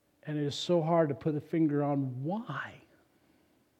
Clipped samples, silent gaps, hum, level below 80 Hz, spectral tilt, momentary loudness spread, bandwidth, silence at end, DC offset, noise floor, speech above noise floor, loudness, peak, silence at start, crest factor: under 0.1%; none; none; -76 dBFS; -7 dB/octave; 11 LU; 9.4 kHz; 1 s; under 0.1%; -68 dBFS; 38 dB; -31 LUFS; -14 dBFS; 0.25 s; 18 dB